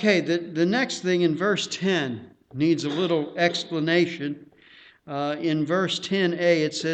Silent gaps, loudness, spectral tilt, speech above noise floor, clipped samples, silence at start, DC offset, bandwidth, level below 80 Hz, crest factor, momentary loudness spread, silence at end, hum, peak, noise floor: none; -24 LUFS; -5 dB/octave; 29 dB; under 0.1%; 0 s; under 0.1%; 8.8 kHz; -68 dBFS; 20 dB; 10 LU; 0 s; none; -4 dBFS; -52 dBFS